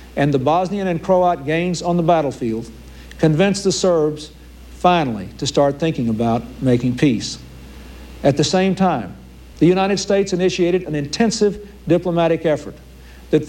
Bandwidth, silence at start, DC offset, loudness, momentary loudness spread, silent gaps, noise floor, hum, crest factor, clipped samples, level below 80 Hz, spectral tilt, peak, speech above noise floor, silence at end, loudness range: 16.5 kHz; 0 s; under 0.1%; -18 LUFS; 14 LU; none; -37 dBFS; none; 16 dB; under 0.1%; -42 dBFS; -5.5 dB/octave; -2 dBFS; 20 dB; 0 s; 2 LU